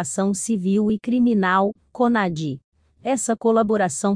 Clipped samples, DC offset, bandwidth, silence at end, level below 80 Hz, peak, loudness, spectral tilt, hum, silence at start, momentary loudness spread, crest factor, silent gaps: under 0.1%; under 0.1%; 10.5 kHz; 0 s; -58 dBFS; -6 dBFS; -21 LUFS; -5.5 dB/octave; none; 0 s; 8 LU; 14 dB; 2.64-2.72 s